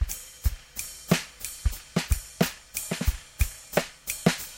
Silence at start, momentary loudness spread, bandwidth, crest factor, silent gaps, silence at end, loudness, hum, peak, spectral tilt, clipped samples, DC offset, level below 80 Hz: 0 s; 7 LU; 17 kHz; 26 dB; none; 0 s; -30 LUFS; none; -4 dBFS; -4.5 dB/octave; under 0.1%; under 0.1%; -34 dBFS